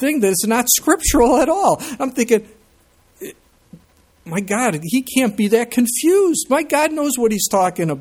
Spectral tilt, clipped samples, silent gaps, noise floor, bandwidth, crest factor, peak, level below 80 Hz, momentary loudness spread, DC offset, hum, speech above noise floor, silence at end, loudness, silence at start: -3.5 dB/octave; under 0.1%; none; -55 dBFS; 18 kHz; 18 dB; 0 dBFS; -40 dBFS; 8 LU; under 0.1%; none; 38 dB; 0 s; -16 LUFS; 0 s